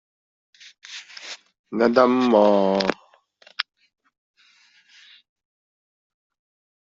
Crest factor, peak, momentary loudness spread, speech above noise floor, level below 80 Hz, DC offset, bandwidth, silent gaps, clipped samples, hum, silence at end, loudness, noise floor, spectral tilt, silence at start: 24 dB; -2 dBFS; 22 LU; 39 dB; -66 dBFS; under 0.1%; 7.8 kHz; 1.59-1.64 s; under 0.1%; none; 3.25 s; -20 LUFS; -58 dBFS; -5.5 dB/octave; 0.9 s